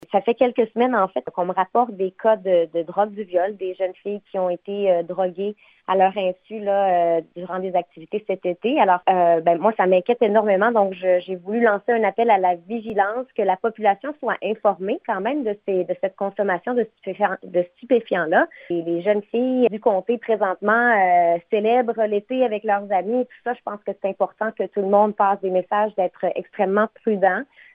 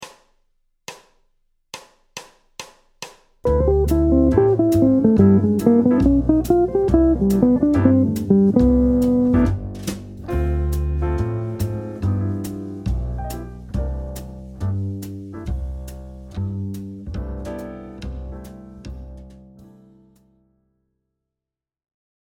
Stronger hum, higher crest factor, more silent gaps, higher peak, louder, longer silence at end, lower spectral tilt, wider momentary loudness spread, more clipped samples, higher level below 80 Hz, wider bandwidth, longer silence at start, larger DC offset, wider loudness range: neither; about the same, 18 dB vs 20 dB; neither; about the same, -2 dBFS vs 0 dBFS; about the same, -21 LUFS vs -19 LUFS; second, 0.3 s vs 2.7 s; about the same, -9 dB/octave vs -8.5 dB/octave; second, 9 LU vs 23 LU; neither; second, -72 dBFS vs -30 dBFS; second, 4.8 kHz vs 17 kHz; about the same, 0.1 s vs 0 s; neither; second, 4 LU vs 18 LU